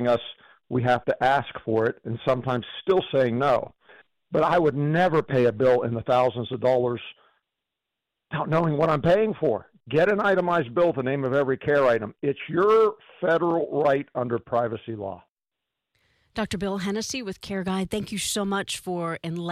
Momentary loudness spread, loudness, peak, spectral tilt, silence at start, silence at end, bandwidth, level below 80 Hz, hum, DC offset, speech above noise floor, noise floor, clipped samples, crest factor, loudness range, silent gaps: 10 LU; -24 LUFS; -12 dBFS; -5.5 dB/octave; 0 s; 0 s; 14.5 kHz; -56 dBFS; none; under 0.1%; 63 dB; -86 dBFS; under 0.1%; 12 dB; 6 LU; 15.29-15.37 s